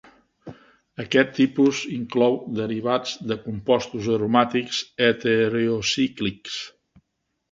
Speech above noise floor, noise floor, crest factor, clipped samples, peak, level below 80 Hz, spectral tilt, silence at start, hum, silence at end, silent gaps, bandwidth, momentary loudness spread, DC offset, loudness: 55 dB; -77 dBFS; 22 dB; under 0.1%; -2 dBFS; -58 dBFS; -5 dB/octave; 0.45 s; none; 0.8 s; none; 7.8 kHz; 10 LU; under 0.1%; -23 LUFS